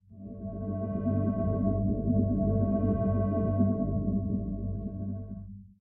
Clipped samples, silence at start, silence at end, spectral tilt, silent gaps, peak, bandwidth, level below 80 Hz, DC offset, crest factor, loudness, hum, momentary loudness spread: under 0.1%; 0.1 s; 0.15 s; -14.5 dB/octave; none; -14 dBFS; 2.6 kHz; -42 dBFS; under 0.1%; 16 dB; -30 LUFS; none; 12 LU